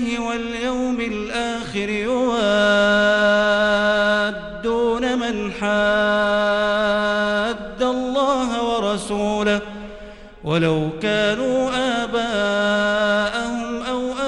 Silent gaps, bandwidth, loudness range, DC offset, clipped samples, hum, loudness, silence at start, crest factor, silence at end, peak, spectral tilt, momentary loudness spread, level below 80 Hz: none; 11.5 kHz; 4 LU; under 0.1%; under 0.1%; none; -20 LUFS; 0 s; 14 dB; 0 s; -6 dBFS; -4.5 dB/octave; 8 LU; -44 dBFS